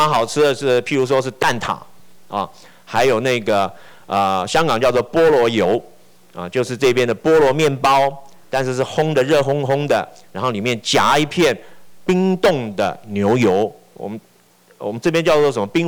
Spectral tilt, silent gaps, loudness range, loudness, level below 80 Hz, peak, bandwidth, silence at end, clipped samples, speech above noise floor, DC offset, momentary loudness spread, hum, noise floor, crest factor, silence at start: -5 dB/octave; none; 3 LU; -17 LUFS; -52 dBFS; -8 dBFS; over 20 kHz; 0 s; under 0.1%; 36 dB; under 0.1%; 11 LU; none; -52 dBFS; 10 dB; 0 s